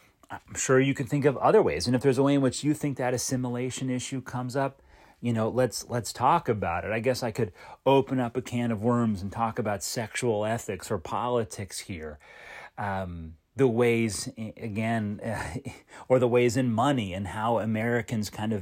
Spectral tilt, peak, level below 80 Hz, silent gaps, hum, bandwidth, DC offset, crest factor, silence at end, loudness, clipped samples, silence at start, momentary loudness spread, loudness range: -5.5 dB/octave; -10 dBFS; -56 dBFS; none; none; 16 kHz; under 0.1%; 18 dB; 0 s; -27 LUFS; under 0.1%; 0.3 s; 13 LU; 5 LU